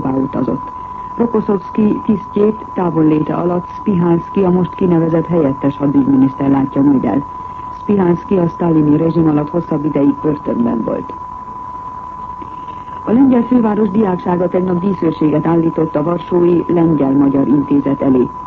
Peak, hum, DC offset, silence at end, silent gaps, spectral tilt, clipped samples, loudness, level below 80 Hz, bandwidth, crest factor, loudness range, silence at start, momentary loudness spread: -2 dBFS; none; under 0.1%; 0 s; none; -11 dB/octave; under 0.1%; -14 LUFS; -42 dBFS; 4.5 kHz; 12 dB; 4 LU; 0 s; 15 LU